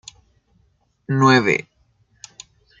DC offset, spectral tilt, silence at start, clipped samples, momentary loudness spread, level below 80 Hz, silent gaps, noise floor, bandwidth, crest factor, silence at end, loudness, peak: under 0.1%; -5.5 dB/octave; 1.1 s; under 0.1%; 26 LU; -62 dBFS; none; -63 dBFS; 7.8 kHz; 20 dB; 1.2 s; -17 LUFS; -2 dBFS